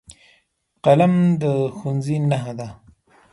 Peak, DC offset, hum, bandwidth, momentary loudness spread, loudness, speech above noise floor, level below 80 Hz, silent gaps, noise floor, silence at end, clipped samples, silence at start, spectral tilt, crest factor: -2 dBFS; under 0.1%; none; 11.5 kHz; 16 LU; -19 LUFS; 46 dB; -58 dBFS; none; -64 dBFS; 0.6 s; under 0.1%; 0.85 s; -8 dB/octave; 18 dB